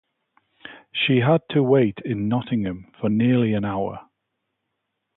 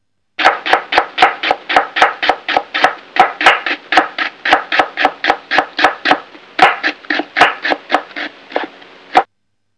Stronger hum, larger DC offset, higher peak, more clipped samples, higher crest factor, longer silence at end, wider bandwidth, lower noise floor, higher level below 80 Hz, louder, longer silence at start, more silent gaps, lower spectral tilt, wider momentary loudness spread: neither; neither; second, -6 dBFS vs 0 dBFS; second, under 0.1% vs 0.9%; about the same, 18 dB vs 14 dB; first, 1.15 s vs 0.55 s; second, 4.1 kHz vs 11 kHz; first, -78 dBFS vs -71 dBFS; about the same, -56 dBFS vs -56 dBFS; second, -22 LUFS vs -14 LUFS; first, 0.65 s vs 0.4 s; neither; first, -11.5 dB/octave vs -2 dB/octave; about the same, 12 LU vs 11 LU